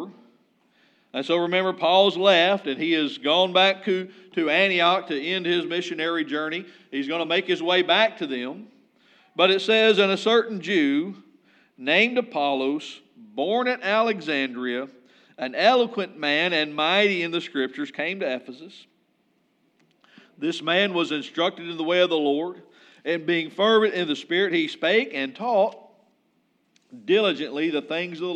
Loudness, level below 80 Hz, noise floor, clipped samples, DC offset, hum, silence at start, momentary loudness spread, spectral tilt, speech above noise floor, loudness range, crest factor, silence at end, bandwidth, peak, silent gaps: -22 LUFS; -90 dBFS; -68 dBFS; under 0.1%; under 0.1%; none; 0 s; 13 LU; -4.5 dB/octave; 45 dB; 6 LU; 20 dB; 0 s; 9.4 kHz; -4 dBFS; none